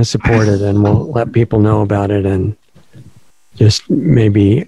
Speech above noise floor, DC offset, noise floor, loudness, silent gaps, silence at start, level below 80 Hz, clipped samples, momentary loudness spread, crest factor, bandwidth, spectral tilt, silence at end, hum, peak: 34 dB; 0.4%; -45 dBFS; -13 LUFS; none; 0 s; -36 dBFS; under 0.1%; 5 LU; 12 dB; 10.5 kHz; -7 dB/octave; 0.05 s; none; 0 dBFS